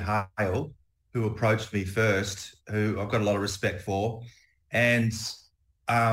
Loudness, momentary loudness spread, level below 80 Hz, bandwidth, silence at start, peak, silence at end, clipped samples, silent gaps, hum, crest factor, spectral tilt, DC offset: -28 LUFS; 12 LU; -56 dBFS; 16 kHz; 0 s; -10 dBFS; 0 s; under 0.1%; none; none; 18 dB; -5.5 dB/octave; under 0.1%